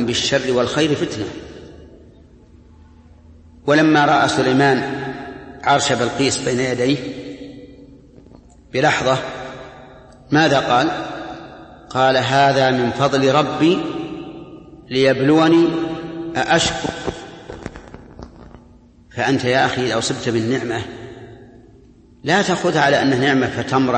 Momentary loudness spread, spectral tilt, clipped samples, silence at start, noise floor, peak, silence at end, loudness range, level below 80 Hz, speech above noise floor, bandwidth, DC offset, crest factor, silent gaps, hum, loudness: 20 LU; -4.5 dB/octave; under 0.1%; 0 s; -47 dBFS; -2 dBFS; 0 s; 6 LU; -48 dBFS; 30 dB; 8.8 kHz; under 0.1%; 18 dB; none; none; -17 LUFS